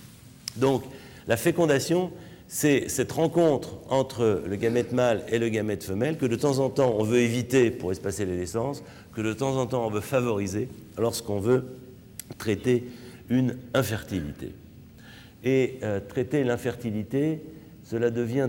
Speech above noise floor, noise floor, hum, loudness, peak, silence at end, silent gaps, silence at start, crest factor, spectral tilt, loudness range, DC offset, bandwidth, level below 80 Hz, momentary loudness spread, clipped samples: 22 dB; -48 dBFS; none; -26 LUFS; -12 dBFS; 0 s; none; 0 s; 16 dB; -6 dB/octave; 4 LU; under 0.1%; 17 kHz; -58 dBFS; 14 LU; under 0.1%